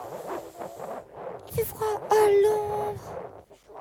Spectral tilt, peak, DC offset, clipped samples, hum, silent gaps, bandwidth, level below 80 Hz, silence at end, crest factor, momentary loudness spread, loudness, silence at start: -5 dB/octave; -10 dBFS; under 0.1%; under 0.1%; none; none; over 20 kHz; -58 dBFS; 0 s; 18 dB; 20 LU; -26 LUFS; 0 s